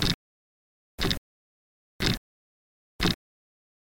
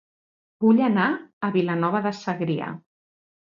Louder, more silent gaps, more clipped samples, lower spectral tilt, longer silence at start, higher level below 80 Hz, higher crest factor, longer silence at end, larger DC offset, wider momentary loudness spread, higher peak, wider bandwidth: second, -30 LUFS vs -23 LUFS; first, 0.14-0.98 s, 1.18-2.00 s, 2.17-2.99 s vs 1.33-1.41 s; neither; second, -4 dB/octave vs -7.5 dB/octave; second, 0 s vs 0.6 s; first, -42 dBFS vs -70 dBFS; first, 28 dB vs 16 dB; about the same, 0.8 s vs 0.7 s; neither; second, 6 LU vs 10 LU; about the same, -6 dBFS vs -8 dBFS; first, 17 kHz vs 7.4 kHz